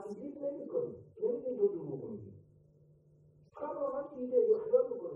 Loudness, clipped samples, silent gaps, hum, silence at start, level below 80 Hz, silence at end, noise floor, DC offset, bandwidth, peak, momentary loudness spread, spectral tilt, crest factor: -35 LUFS; under 0.1%; none; none; 0 s; -76 dBFS; 0 s; -64 dBFS; under 0.1%; 2.6 kHz; -16 dBFS; 15 LU; -10.5 dB/octave; 20 dB